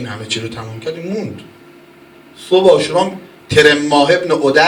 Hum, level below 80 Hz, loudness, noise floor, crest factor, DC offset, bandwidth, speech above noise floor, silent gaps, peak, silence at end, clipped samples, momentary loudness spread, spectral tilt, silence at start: none; -50 dBFS; -13 LUFS; -42 dBFS; 14 dB; under 0.1%; 16 kHz; 28 dB; none; 0 dBFS; 0 s; 0.2%; 16 LU; -4.5 dB/octave; 0 s